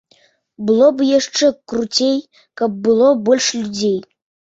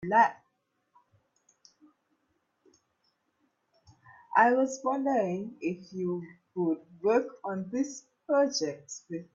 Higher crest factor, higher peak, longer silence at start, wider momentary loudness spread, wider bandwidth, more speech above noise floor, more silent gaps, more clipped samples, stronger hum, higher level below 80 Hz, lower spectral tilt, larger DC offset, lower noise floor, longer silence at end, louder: second, 16 dB vs 22 dB; first, -2 dBFS vs -10 dBFS; first, 0.6 s vs 0 s; second, 10 LU vs 14 LU; about the same, 8 kHz vs 8 kHz; second, 40 dB vs 49 dB; neither; neither; neither; first, -60 dBFS vs -76 dBFS; about the same, -3.5 dB/octave vs -4.5 dB/octave; neither; second, -56 dBFS vs -77 dBFS; first, 0.45 s vs 0.1 s; first, -16 LUFS vs -29 LUFS